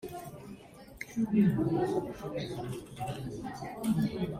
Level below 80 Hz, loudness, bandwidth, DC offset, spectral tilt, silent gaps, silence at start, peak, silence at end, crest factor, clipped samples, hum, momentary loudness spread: -58 dBFS; -33 LUFS; 16 kHz; under 0.1%; -7.5 dB/octave; none; 0 s; -16 dBFS; 0 s; 18 dB; under 0.1%; none; 19 LU